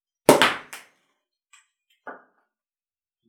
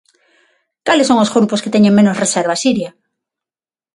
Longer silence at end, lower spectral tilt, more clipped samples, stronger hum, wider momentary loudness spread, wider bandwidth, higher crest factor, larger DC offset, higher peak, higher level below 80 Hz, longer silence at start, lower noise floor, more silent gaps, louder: about the same, 1.15 s vs 1.05 s; second, -3 dB/octave vs -4.5 dB/octave; neither; neither; first, 26 LU vs 9 LU; first, over 20 kHz vs 11.5 kHz; first, 26 dB vs 16 dB; neither; about the same, 0 dBFS vs 0 dBFS; about the same, -62 dBFS vs -60 dBFS; second, 0.3 s vs 0.85 s; about the same, under -90 dBFS vs under -90 dBFS; neither; second, -19 LUFS vs -13 LUFS